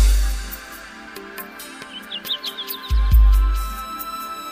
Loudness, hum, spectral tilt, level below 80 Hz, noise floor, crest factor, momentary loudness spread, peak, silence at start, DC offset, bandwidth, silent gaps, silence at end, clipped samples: -23 LUFS; none; -4 dB/octave; -20 dBFS; -38 dBFS; 16 dB; 18 LU; -4 dBFS; 0 s; under 0.1%; 15.5 kHz; none; 0 s; under 0.1%